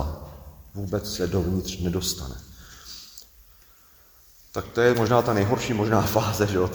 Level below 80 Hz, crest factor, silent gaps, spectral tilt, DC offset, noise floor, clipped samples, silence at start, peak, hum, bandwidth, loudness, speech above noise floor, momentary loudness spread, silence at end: -42 dBFS; 22 dB; none; -5.5 dB/octave; under 0.1%; -54 dBFS; under 0.1%; 0 s; -4 dBFS; none; over 20 kHz; -24 LUFS; 31 dB; 22 LU; 0 s